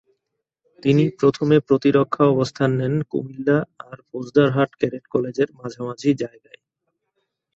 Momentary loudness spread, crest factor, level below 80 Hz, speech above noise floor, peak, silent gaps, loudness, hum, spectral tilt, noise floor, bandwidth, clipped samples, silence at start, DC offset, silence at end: 13 LU; 18 dB; -60 dBFS; 59 dB; -2 dBFS; none; -20 LUFS; none; -7.5 dB/octave; -79 dBFS; 7.8 kHz; under 0.1%; 0.85 s; under 0.1%; 1.3 s